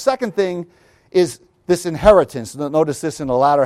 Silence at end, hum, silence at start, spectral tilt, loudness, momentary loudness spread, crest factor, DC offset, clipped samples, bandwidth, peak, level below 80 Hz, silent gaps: 0 s; none; 0 s; -5.5 dB/octave; -18 LUFS; 13 LU; 16 dB; under 0.1%; under 0.1%; 15 kHz; 0 dBFS; -40 dBFS; none